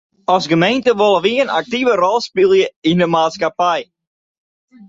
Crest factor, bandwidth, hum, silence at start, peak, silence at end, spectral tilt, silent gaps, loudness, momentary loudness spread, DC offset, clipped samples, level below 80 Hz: 14 dB; 7.8 kHz; none; 0.3 s; -2 dBFS; 1.05 s; -5.5 dB/octave; 2.76-2.82 s; -15 LUFS; 4 LU; under 0.1%; under 0.1%; -58 dBFS